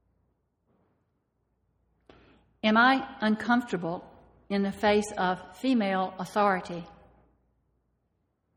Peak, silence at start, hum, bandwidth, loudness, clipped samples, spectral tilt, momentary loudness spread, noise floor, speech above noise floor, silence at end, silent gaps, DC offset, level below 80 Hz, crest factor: -10 dBFS; 2.65 s; none; 14 kHz; -27 LUFS; under 0.1%; -5.5 dB/octave; 11 LU; -76 dBFS; 49 dB; 1.65 s; none; under 0.1%; -64 dBFS; 20 dB